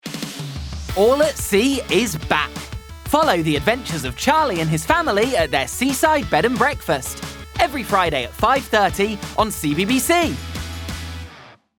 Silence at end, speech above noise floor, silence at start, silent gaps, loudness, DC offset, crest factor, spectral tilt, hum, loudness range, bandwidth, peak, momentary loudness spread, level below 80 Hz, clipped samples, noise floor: 0.3 s; 26 dB; 0.05 s; none; -19 LUFS; under 0.1%; 18 dB; -4 dB/octave; none; 2 LU; over 20 kHz; -2 dBFS; 13 LU; -38 dBFS; under 0.1%; -44 dBFS